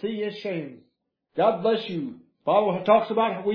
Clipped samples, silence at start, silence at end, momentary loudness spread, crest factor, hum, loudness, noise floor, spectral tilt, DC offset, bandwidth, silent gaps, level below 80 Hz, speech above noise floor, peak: under 0.1%; 0 s; 0 s; 14 LU; 18 dB; none; -24 LUFS; -65 dBFS; -8 dB/octave; under 0.1%; 5.4 kHz; none; -74 dBFS; 41 dB; -6 dBFS